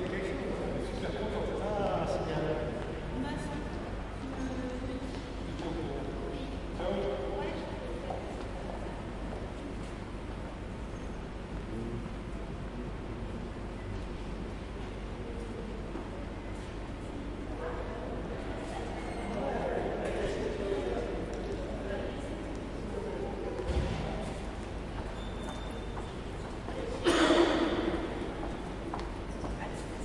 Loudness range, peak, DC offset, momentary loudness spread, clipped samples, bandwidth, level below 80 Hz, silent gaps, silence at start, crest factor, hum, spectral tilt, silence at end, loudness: 9 LU; -12 dBFS; under 0.1%; 8 LU; under 0.1%; 11.5 kHz; -42 dBFS; none; 0 s; 22 dB; none; -6 dB/octave; 0 s; -36 LUFS